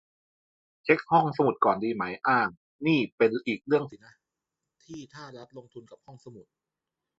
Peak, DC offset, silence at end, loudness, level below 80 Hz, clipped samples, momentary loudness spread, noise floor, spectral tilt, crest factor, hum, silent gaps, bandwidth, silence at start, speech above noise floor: -6 dBFS; under 0.1%; 0.75 s; -26 LUFS; -70 dBFS; under 0.1%; 22 LU; -88 dBFS; -7 dB/octave; 22 dB; none; 2.57-2.79 s, 3.12-3.18 s; 7.6 kHz; 0.85 s; 60 dB